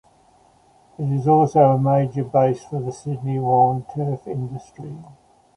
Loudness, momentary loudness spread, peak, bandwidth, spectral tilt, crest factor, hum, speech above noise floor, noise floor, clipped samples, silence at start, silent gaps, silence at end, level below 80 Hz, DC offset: -20 LUFS; 19 LU; -2 dBFS; 10.5 kHz; -9.5 dB/octave; 18 dB; none; 36 dB; -55 dBFS; under 0.1%; 1 s; none; 0.45 s; -58 dBFS; under 0.1%